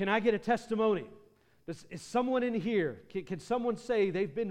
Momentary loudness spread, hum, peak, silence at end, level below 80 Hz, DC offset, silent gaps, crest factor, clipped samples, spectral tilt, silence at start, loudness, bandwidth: 15 LU; none; -14 dBFS; 0 s; -66 dBFS; under 0.1%; none; 18 dB; under 0.1%; -6 dB/octave; 0 s; -32 LUFS; 11.5 kHz